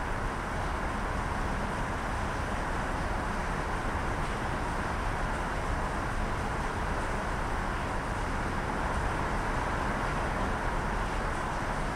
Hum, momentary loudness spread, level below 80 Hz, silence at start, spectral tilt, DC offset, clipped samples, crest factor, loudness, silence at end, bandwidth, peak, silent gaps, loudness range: none; 2 LU; -36 dBFS; 0 s; -5.5 dB/octave; under 0.1%; under 0.1%; 12 dB; -33 LUFS; 0 s; 14 kHz; -18 dBFS; none; 1 LU